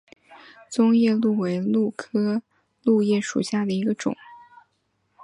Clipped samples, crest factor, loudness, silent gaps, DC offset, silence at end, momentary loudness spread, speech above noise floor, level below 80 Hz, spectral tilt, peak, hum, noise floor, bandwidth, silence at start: under 0.1%; 16 dB; -23 LUFS; none; under 0.1%; 0.85 s; 10 LU; 49 dB; -70 dBFS; -6 dB/octave; -8 dBFS; none; -71 dBFS; 11 kHz; 0.3 s